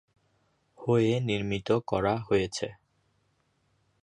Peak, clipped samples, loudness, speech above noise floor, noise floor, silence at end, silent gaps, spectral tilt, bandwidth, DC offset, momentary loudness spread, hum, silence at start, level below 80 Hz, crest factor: -12 dBFS; under 0.1%; -28 LUFS; 45 dB; -72 dBFS; 1.3 s; none; -6 dB/octave; 10.5 kHz; under 0.1%; 11 LU; none; 0.8 s; -56 dBFS; 18 dB